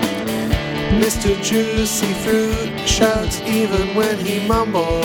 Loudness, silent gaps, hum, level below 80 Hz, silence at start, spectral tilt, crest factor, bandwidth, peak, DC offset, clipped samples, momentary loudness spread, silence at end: -18 LUFS; none; none; -30 dBFS; 0 s; -4.5 dB/octave; 16 dB; 19.5 kHz; -2 dBFS; under 0.1%; under 0.1%; 5 LU; 0 s